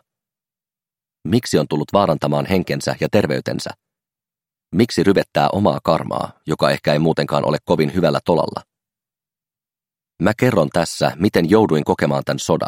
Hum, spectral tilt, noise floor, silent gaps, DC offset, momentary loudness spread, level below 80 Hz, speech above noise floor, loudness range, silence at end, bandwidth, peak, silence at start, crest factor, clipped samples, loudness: none; -6 dB/octave; under -90 dBFS; none; under 0.1%; 8 LU; -50 dBFS; over 73 dB; 3 LU; 0 s; 16.5 kHz; 0 dBFS; 1.25 s; 18 dB; under 0.1%; -18 LUFS